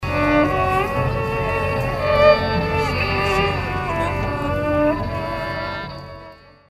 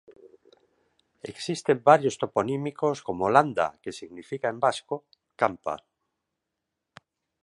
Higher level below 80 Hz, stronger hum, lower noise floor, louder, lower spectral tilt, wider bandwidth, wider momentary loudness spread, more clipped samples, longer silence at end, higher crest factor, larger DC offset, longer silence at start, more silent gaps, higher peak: first, -34 dBFS vs -66 dBFS; neither; second, -42 dBFS vs -84 dBFS; first, -20 LUFS vs -26 LUFS; about the same, -6.5 dB/octave vs -5.5 dB/octave; first, 15.5 kHz vs 11.5 kHz; second, 11 LU vs 18 LU; neither; second, 0.35 s vs 1.7 s; second, 18 dB vs 24 dB; neither; about the same, 0 s vs 0.1 s; neither; first, 0 dBFS vs -4 dBFS